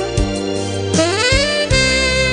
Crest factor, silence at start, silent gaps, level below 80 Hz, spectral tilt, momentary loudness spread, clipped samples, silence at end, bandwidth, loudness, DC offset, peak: 14 dB; 0 s; none; -26 dBFS; -3.5 dB/octave; 7 LU; under 0.1%; 0 s; 10 kHz; -15 LUFS; under 0.1%; -2 dBFS